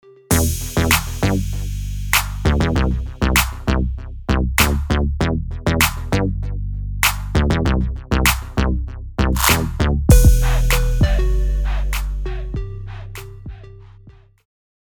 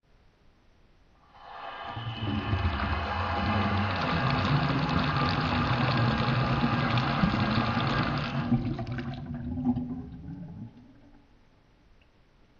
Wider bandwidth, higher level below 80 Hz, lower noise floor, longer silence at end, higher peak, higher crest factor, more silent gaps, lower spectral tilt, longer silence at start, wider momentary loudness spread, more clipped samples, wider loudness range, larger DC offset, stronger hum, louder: first, over 20 kHz vs 7.2 kHz; first, -20 dBFS vs -44 dBFS; second, -45 dBFS vs -60 dBFS; second, 0.8 s vs 1.45 s; first, 0 dBFS vs -10 dBFS; about the same, 18 dB vs 18 dB; neither; second, -4.5 dB/octave vs -7.5 dB/octave; second, 0.3 s vs 1.35 s; about the same, 12 LU vs 14 LU; neither; second, 5 LU vs 9 LU; neither; neither; first, -19 LUFS vs -28 LUFS